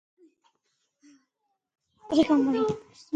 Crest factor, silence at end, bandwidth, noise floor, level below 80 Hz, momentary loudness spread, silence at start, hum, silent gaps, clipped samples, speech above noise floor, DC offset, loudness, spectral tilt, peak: 20 dB; 0 s; 9 kHz; -80 dBFS; -64 dBFS; 9 LU; 2.1 s; none; none; under 0.1%; 55 dB; under 0.1%; -25 LUFS; -6 dB/octave; -10 dBFS